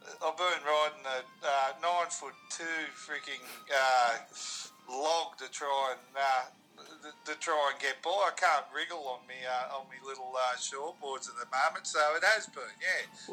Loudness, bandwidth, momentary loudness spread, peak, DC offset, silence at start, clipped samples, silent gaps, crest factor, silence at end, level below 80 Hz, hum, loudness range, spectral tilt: -33 LUFS; 18.5 kHz; 14 LU; -14 dBFS; under 0.1%; 0.05 s; under 0.1%; none; 20 dB; 0 s; under -90 dBFS; none; 3 LU; 0 dB/octave